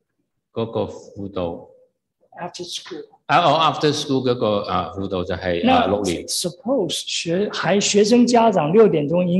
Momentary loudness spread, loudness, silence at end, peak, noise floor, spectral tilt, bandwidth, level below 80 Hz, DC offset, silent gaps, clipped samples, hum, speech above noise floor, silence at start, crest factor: 16 LU; -19 LUFS; 0 s; -2 dBFS; -75 dBFS; -4.5 dB/octave; 12.5 kHz; -54 dBFS; under 0.1%; none; under 0.1%; none; 56 dB; 0.55 s; 16 dB